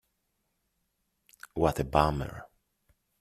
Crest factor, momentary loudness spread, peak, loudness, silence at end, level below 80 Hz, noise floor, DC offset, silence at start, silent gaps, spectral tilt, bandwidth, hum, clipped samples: 28 dB; 15 LU; -6 dBFS; -28 LUFS; 0.75 s; -48 dBFS; -79 dBFS; under 0.1%; 1.55 s; none; -6.5 dB/octave; 14.5 kHz; none; under 0.1%